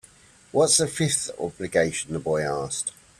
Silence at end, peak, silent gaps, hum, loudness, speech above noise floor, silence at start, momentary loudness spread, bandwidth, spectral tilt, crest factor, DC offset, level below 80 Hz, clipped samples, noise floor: 0.3 s; -6 dBFS; none; none; -24 LUFS; 29 dB; 0.55 s; 10 LU; 15 kHz; -3 dB/octave; 20 dB; under 0.1%; -56 dBFS; under 0.1%; -53 dBFS